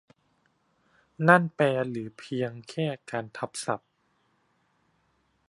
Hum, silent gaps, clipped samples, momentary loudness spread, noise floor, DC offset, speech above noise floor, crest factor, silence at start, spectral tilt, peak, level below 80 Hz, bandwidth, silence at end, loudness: none; none; under 0.1%; 15 LU; -71 dBFS; under 0.1%; 44 dB; 28 dB; 1.2 s; -6 dB/octave; -2 dBFS; -74 dBFS; 11.5 kHz; 1.7 s; -27 LUFS